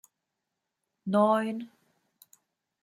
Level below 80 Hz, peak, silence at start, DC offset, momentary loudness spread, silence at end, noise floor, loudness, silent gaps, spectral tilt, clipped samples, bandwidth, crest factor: -82 dBFS; -12 dBFS; 1.05 s; under 0.1%; 18 LU; 1.15 s; -85 dBFS; -27 LUFS; none; -7 dB/octave; under 0.1%; 15.5 kHz; 20 dB